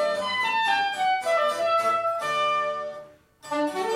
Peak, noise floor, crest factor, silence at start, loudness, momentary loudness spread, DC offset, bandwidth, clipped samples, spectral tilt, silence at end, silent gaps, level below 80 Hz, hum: -12 dBFS; -47 dBFS; 14 dB; 0 s; -24 LUFS; 9 LU; under 0.1%; 16 kHz; under 0.1%; -2.5 dB/octave; 0 s; none; -70 dBFS; none